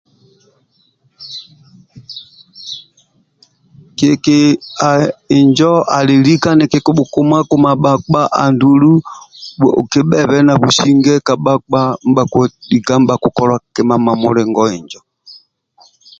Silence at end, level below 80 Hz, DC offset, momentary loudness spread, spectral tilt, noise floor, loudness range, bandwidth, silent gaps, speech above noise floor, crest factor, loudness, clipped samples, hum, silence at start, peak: 0.85 s; -48 dBFS; under 0.1%; 19 LU; -6 dB/octave; -57 dBFS; 10 LU; 7.8 kHz; none; 46 dB; 12 dB; -11 LUFS; under 0.1%; none; 1.2 s; 0 dBFS